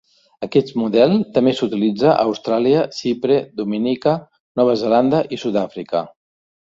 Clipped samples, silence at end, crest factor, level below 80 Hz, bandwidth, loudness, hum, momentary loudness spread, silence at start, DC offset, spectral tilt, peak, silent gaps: under 0.1%; 0.65 s; 16 dB; -60 dBFS; 7.8 kHz; -18 LUFS; none; 9 LU; 0.4 s; under 0.1%; -7 dB/octave; -2 dBFS; 4.40-4.55 s